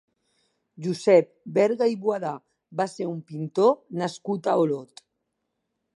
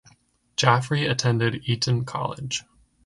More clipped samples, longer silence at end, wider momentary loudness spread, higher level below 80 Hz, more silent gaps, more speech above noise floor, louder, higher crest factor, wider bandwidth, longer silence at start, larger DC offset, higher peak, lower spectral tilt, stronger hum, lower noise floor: neither; first, 1.1 s vs 0.45 s; first, 14 LU vs 10 LU; second, -78 dBFS vs -56 dBFS; neither; first, 55 dB vs 37 dB; about the same, -25 LUFS vs -24 LUFS; about the same, 20 dB vs 24 dB; about the same, 11.5 kHz vs 11.5 kHz; first, 0.8 s vs 0.6 s; neither; about the same, -4 dBFS vs -2 dBFS; first, -6.5 dB/octave vs -4.5 dB/octave; neither; first, -79 dBFS vs -60 dBFS